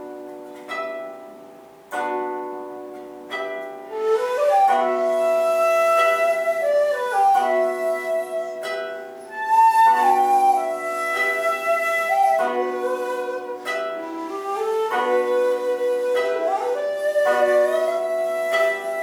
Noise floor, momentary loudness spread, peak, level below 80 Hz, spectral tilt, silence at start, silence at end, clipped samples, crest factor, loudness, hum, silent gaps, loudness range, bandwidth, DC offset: -44 dBFS; 15 LU; -8 dBFS; -72 dBFS; -2 dB/octave; 0 s; 0 s; under 0.1%; 14 dB; -21 LUFS; none; none; 6 LU; 19 kHz; under 0.1%